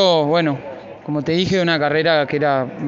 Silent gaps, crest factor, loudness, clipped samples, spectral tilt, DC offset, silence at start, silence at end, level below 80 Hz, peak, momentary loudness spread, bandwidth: none; 14 dB; -18 LUFS; under 0.1%; -3.5 dB/octave; under 0.1%; 0 s; 0 s; -54 dBFS; -4 dBFS; 11 LU; 7.6 kHz